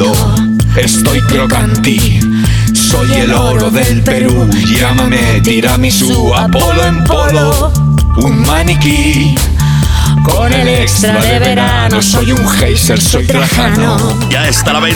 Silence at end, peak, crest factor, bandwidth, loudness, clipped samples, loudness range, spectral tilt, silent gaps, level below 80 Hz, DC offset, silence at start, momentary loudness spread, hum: 0 s; 0 dBFS; 8 dB; 20 kHz; -9 LUFS; under 0.1%; 1 LU; -4.5 dB/octave; none; -18 dBFS; under 0.1%; 0 s; 1 LU; none